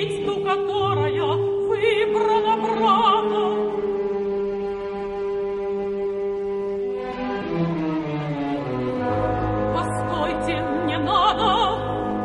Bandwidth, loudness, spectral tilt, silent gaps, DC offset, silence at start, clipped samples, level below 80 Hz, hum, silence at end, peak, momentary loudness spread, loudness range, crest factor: 11.5 kHz; -23 LUFS; -6.5 dB/octave; none; under 0.1%; 0 s; under 0.1%; -44 dBFS; none; 0 s; -6 dBFS; 8 LU; 6 LU; 16 dB